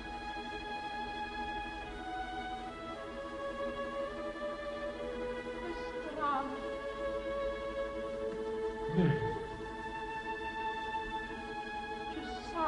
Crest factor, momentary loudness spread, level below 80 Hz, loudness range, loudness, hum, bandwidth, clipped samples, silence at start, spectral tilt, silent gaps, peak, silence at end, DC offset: 20 dB; 7 LU; -54 dBFS; 4 LU; -39 LUFS; none; 11.5 kHz; under 0.1%; 0 s; -6 dB/octave; none; -18 dBFS; 0 s; under 0.1%